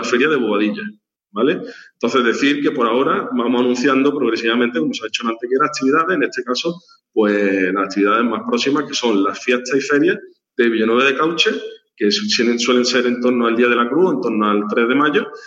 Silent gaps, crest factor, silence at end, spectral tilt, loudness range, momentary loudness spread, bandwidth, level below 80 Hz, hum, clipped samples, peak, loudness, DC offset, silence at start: none; 16 dB; 0 s; -4 dB/octave; 2 LU; 7 LU; 8 kHz; -76 dBFS; none; under 0.1%; -2 dBFS; -17 LUFS; under 0.1%; 0 s